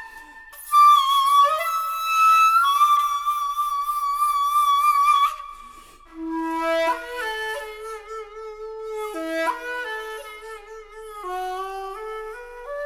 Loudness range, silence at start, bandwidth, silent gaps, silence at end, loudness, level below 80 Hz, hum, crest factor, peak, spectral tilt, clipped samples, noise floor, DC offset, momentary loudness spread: 13 LU; 0 s; 20 kHz; none; 0 s; -20 LUFS; -54 dBFS; none; 16 dB; -6 dBFS; -0.5 dB/octave; under 0.1%; -45 dBFS; under 0.1%; 22 LU